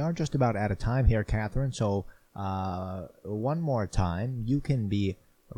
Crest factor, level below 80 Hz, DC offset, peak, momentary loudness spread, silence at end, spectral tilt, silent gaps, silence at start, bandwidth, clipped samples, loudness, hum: 20 dB; -38 dBFS; under 0.1%; -10 dBFS; 11 LU; 0.05 s; -7.5 dB/octave; none; 0 s; 10.5 kHz; under 0.1%; -30 LUFS; none